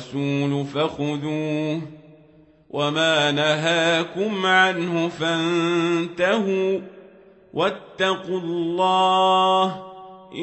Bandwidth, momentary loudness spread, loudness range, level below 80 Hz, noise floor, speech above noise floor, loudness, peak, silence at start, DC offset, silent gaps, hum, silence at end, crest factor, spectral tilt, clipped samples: 8.4 kHz; 9 LU; 4 LU; -66 dBFS; -53 dBFS; 31 dB; -21 LUFS; -4 dBFS; 0 s; under 0.1%; none; none; 0 s; 18 dB; -5 dB/octave; under 0.1%